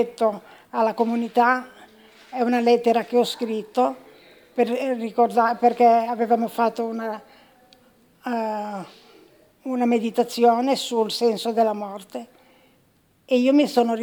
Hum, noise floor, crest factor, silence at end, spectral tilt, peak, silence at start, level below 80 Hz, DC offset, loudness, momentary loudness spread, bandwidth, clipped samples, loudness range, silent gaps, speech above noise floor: none; -61 dBFS; 16 dB; 0 s; -4.5 dB/octave; -6 dBFS; 0 s; -74 dBFS; under 0.1%; -22 LUFS; 15 LU; over 20 kHz; under 0.1%; 6 LU; none; 40 dB